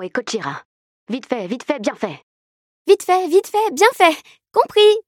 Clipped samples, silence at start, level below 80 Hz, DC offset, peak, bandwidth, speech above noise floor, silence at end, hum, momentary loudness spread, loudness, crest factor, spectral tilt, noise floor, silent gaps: under 0.1%; 0 s; -72 dBFS; under 0.1%; 0 dBFS; 17 kHz; over 73 dB; 0.05 s; none; 16 LU; -17 LUFS; 18 dB; -3 dB/octave; under -90 dBFS; 0.65-1.07 s, 2.23-2.85 s